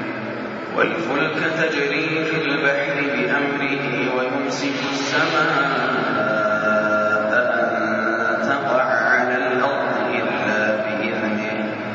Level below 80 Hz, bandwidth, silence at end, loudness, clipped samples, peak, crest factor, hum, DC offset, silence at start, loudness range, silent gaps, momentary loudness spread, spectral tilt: -64 dBFS; 7.6 kHz; 0 s; -20 LUFS; under 0.1%; -4 dBFS; 16 dB; none; under 0.1%; 0 s; 2 LU; none; 5 LU; -2.5 dB/octave